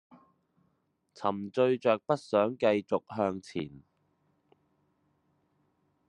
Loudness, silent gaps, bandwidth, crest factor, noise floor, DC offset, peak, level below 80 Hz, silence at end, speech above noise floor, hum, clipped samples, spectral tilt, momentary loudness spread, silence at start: -30 LUFS; none; 10.5 kHz; 22 dB; -76 dBFS; under 0.1%; -10 dBFS; -76 dBFS; 2.3 s; 46 dB; none; under 0.1%; -6.5 dB/octave; 11 LU; 1.2 s